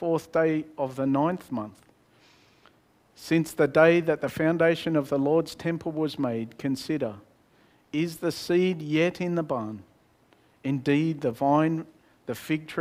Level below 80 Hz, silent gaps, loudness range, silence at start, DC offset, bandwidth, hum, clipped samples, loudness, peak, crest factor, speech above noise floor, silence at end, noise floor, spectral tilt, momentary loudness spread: -66 dBFS; none; 5 LU; 0 s; under 0.1%; 16 kHz; none; under 0.1%; -26 LUFS; -4 dBFS; 22 dB; 36 dB; 0 s; -62 dBFS; -6.5 dB/octave; 12 LU